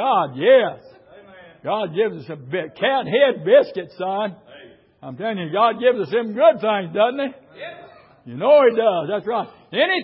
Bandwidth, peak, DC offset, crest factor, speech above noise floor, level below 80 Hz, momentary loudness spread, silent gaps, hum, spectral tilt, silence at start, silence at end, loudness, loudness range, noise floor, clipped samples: 5.8 kHz; -2 dBFS; under 0.1%; 18 dB; 27 dB; -70 dBFS; 14 LU; none; none; -10 dB/octave; 0 s; 0 s; -19 LUFS; 2 LU; -46 dBFS; under 0.1%